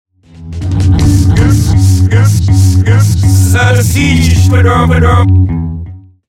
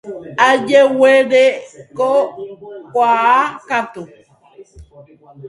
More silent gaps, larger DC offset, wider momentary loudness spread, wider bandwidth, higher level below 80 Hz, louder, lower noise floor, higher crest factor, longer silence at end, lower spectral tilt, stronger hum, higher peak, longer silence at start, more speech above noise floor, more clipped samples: neither; neither; second, 9 LU vs 21 LU; first, 15 kHz vs 11.5 kHz; first, -20 dBFS vs -54 dBFS; first, -8 LUFS vs -13 LUFS; second, -27 dBFS vs -44 dBFS; second, 8 dB vs 16 dB; first, 0.3 s vs 0 s; first, -6 dB/octave vs -4 dB/octave; neither; about the same, 0 dBFS vs 0 dBFS; first, 0.4 s vs 0.05 s; second, 21 dB vs 29 dB; neither